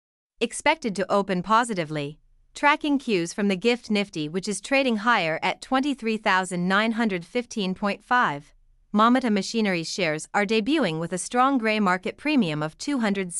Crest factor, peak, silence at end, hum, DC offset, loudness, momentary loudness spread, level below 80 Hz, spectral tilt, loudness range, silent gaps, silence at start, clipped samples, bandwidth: 18 dB; -6 dBFS; 0 s; none; under 0.1%; -24 LUFS; 8 LU; -60 dBFS; -4.5 dB/octave; 1 LU; none; 0.4 s; under 0.1%; 12 kHz